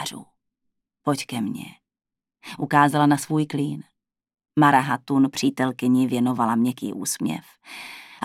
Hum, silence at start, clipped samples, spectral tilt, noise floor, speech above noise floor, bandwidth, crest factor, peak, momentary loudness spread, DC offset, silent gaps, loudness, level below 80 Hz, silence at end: none; 0 s; under 0.1%; -5 dB/octave; -88 dBFS; 67 dB; 16 kHz; 20 dB; -4 dBFS; 19 LU; under 0.1%; none; -22 LUFS; -72 dBFS; 0 s